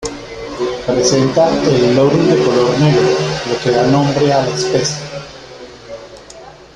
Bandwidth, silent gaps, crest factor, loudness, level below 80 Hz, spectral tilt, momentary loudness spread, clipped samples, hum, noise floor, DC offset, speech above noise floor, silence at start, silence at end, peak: 11 kHz; none; 14 dB; -13 LUFS; -42 dBFS; -5.5 dB/octave; 21 LU; under 0.1%; none; -36 dBFS; under 0.1%; 24 dB; 0 s; 0.25 s; -2 dBFS